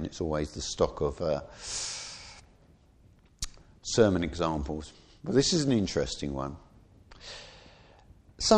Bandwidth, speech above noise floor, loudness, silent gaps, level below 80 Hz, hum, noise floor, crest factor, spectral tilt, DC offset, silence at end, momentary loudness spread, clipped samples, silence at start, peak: 12.5 kHz; 30 dB; -30 LUFS; none; -48 dBFS; none; -59 dBFS; 24 dB; -4.5 dB/octave; under 0.1%; 0 s; 20 LU; under 0.1%; 0 s; -8 dBFS